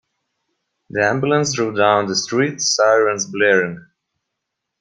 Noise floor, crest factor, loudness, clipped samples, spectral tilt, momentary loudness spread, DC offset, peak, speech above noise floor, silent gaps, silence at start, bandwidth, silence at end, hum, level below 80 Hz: -79 dBFS; 18 dB; -17 LUFS; under 0.1%; -3.5 dB/octave; 5 LU; under 0.1%; -2 dBFS; 62 dB; none; 0.95 s; 10.5 kHz; 1 s; none; -62 dBFS